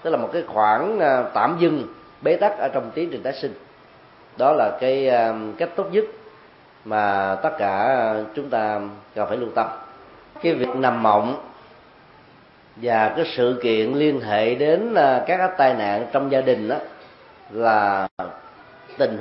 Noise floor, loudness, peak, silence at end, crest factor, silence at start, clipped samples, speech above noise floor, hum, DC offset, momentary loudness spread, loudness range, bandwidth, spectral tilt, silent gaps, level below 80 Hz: -50 dBFS; -21 LUFS; -2 dBFS; 0 s; 18 dB; 0 s; under 0.1%; 30 dB; none; under 0.1%; 10 LU; 4 LU; 5.8 kHz; -10 dB/octave; 18.11-18.17 s; -66 dBFS